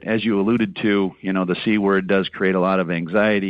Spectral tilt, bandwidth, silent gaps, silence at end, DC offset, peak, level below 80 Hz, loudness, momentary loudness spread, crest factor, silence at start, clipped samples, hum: -9 dB/octave; 5.2 kHz; none; 0 s; under 0.1%; -6 dBFS; -54 dBFS; -20 LUFS; 3 LU; 12 dB; 0 s; under 0.1%; none